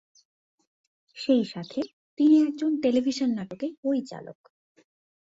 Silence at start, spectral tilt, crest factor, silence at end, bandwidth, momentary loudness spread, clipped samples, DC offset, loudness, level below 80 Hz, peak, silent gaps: 1.15 s; -6 dB/octave; 16 dB; 1 s; 7.8 kHz; 16 LU; under 0.1%; under 0.1%; -26 LUFS; -72 dBFS; -10 dBFS; 1.93-2.17 s, 3.77-3.83 s